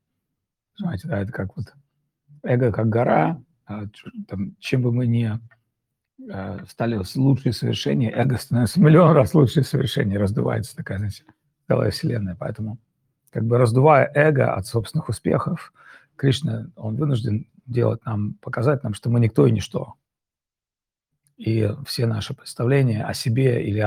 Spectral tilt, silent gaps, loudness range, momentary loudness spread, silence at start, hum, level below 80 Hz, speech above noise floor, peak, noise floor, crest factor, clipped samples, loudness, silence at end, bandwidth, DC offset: -7 dB/octave; none; 7 LU; 16 LU; 0.8 s; none; -56 dBFS; over 69 dB; -2 dBFS; under -90 dBFS; 20 dB; under 0.1%; -21 LUFS; 0 s; 15.5 kHz; under 0.1%